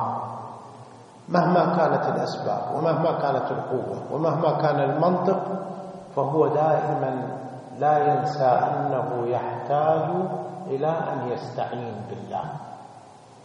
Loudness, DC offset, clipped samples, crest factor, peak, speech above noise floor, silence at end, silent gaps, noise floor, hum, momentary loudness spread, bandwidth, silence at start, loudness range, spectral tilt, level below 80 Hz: -24 LUFS; under 0.1%; under 0.1%; 20 dB; -6 dBFS; 24 dB; 0 s; none; -47 dBFS; none; 14 LU; 10 kHz; 0 s; 3 LU; -8 dB/octave; -70 dBFS